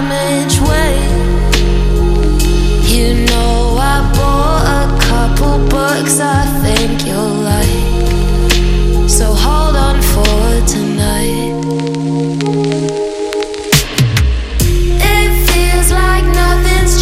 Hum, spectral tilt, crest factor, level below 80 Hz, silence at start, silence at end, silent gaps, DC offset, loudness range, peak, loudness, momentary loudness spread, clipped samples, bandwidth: none; -4.5 dB/octave; 10 dB; -14 dBFS; 0 s; 0 s; none; under 0.1%; 2 LU; 0 dBFS; -12 LUFS; 4 LU; under 0.1%; 16.5 kHz